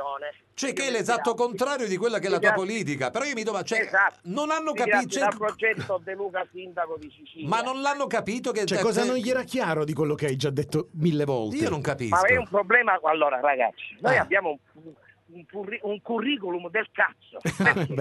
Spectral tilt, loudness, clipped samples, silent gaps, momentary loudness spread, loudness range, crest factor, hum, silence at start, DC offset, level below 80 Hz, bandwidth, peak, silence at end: -4.5 dB/octave; -25 LUFS; under 0.1%; none; 11 LU; 5 LU; 20 dB; none; 0 s; under 0.1%; -62 dBFS; 12 kHz; -6 dBFS; 0 s